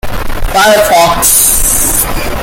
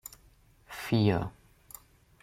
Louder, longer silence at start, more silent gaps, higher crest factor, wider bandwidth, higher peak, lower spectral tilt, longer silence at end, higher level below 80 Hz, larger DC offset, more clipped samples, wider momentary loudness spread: first, -7 LUFS vs -30 LUFS; second, 0.05 s vs 0.7 s; neither; second, 8 dB vs 20 dB; first, over 20 kHz vs 16.5 kHz; first, 0 dBFS vs -12 dBFS; second, -1.5 dB/octave vs -6.5 dB/octave; second, 0 s vs 0.9 s; first, -18 dBFS vs -58 dBFS; neither; first, 0.6% vs under 0.1%; second, 9 LU vs 23 LU